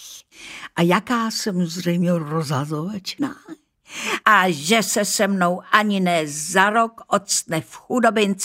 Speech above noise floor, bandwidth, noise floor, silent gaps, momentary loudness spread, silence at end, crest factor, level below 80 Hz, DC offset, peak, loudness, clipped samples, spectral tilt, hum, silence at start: 21 dB; 16 kHz; -41 dBFS; none; 12 LU; 0 s; 20 dB; -66 dBFS; under 0.1%; 0 dBFS; -20 LUFS; under 0.1%; -4 dB/octave; none; 0 s